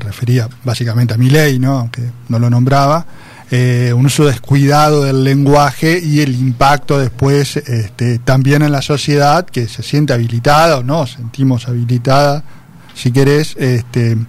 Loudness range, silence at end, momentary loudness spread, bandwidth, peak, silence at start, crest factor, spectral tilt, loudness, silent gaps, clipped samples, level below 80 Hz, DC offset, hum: 2 LU; 0 s; 8 LU; 15 kHz; 0 dBFS; 0 s; 12 dB; -6.5 dB/octave; -12 LUFS; none; under 0.1%; -38 dBFS; under 0.1%; none